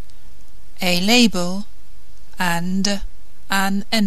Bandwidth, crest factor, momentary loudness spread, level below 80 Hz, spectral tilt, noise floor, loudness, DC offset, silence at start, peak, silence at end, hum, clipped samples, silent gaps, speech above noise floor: 14 kHz; 20 dB; 13 LU; -42 dBFS; -3.5 dB/octave; -45 dBFS; -19 LUFS; 10%; 0.1 s; 0 dBFS; 0 s; none; under 0.1%; none; 27 dB